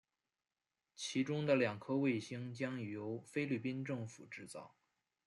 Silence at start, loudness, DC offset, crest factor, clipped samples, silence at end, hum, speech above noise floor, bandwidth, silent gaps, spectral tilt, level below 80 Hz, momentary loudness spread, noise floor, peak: 1 s; -40 LUFS; under 0.1%; 20 dB; under 0.1%; 0.6 s; none; over 51 dB; 12 kHz; none; -6 dB/octave; -84 dBFS; 15 LU; under -90 dBFS; -20 dBFS